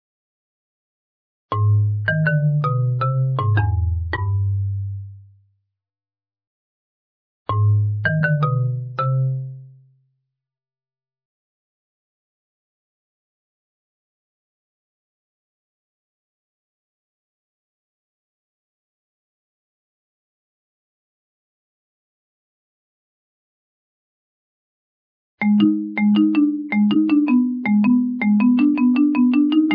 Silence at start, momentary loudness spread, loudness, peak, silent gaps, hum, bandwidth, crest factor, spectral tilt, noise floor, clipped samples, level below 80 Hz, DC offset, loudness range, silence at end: 1.5 s; 8 LU; -19 LUFS; -4 dBFS; 6.47-7.46 s, 11.25-25.38 s; none; 5.2 kHz; 18 dB; -11 dB/octave; under -90 dBFS; under 0.1%; -44 dBFS; under 0.1%; 11 LU; 0 s